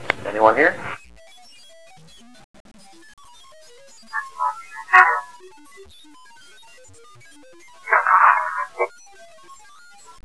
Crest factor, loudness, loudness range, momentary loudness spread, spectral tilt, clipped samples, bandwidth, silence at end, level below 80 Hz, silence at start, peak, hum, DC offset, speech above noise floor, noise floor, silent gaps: 24 dB; -18 LUFS; 12 LU; 20 LU; -3.5 dB/octave; under 0.1%; 11 kHz; 0.7 s; -62 dBFS; 0 s; 0 dBFS; none; 0.4%; 29 dB; -48 dBFS; 2.44-2.54 s, 2.60-2.65 s, 3.13-3.17 s